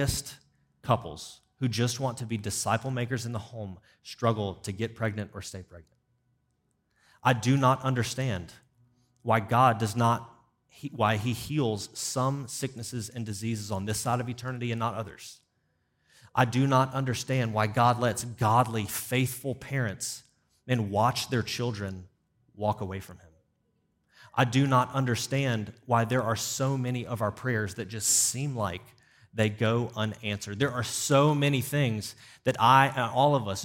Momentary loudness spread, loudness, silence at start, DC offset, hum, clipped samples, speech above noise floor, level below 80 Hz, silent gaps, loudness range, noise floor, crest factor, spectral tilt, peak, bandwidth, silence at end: 14 LU; -28 LUFS; 0 s; under 0.1%; none; under 0.1%; 46 dB; -60 dBFS; none; 7 LU; -74 dBFS; 22 dB; -4.5 dB/octave; -6 dBFS; 16.5 kHz; 0 s